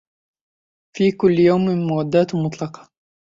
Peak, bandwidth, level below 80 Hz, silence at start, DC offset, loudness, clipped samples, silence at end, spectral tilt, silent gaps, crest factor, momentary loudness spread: -4 dBFS; 7.6 kHz; -56 dBFS; 0.95 s; under 0.1%; -18 LUFS; under 0.1%; 0.55 s; -8 dB/octave; none; 16 dB; 11 LU